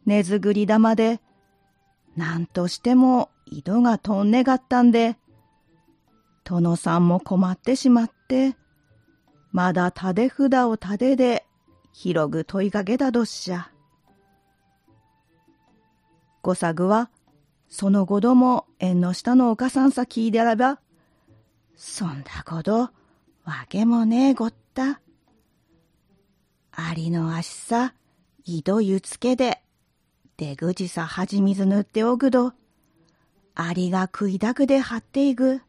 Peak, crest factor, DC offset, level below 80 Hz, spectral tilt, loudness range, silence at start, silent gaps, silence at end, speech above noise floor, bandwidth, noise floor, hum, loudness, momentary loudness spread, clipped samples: -6 dBFS; 16 dB; under 0.1%; -60 dBFS; -6.5 dB/octave; 8 LU; 0.05 s; none; 0.1 s; 48 dB; 11.5 kHz; -68 dBFS; none; -22 LUFS; 13 LU; under 0.1%